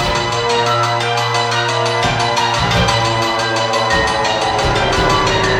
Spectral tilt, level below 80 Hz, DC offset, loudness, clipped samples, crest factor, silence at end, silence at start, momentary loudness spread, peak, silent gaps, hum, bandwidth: -3.5 dB/octave; -32 dBFS; under 0.1%; -14 LUFS; under 0.1%; 14 dB; 0 s; 0 s; 2 LU; -2 dBFS; none; none; 16 kHz